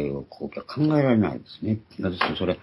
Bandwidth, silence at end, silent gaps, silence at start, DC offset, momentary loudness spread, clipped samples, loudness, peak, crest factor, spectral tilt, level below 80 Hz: 11.5 kHz; 0.05 s; none; 0 s; under 0.1%; 13 LU; under 0.1%; -25 LUFS; -8 dBFS; 18 dB; -9 dB/octave; -56 dBFS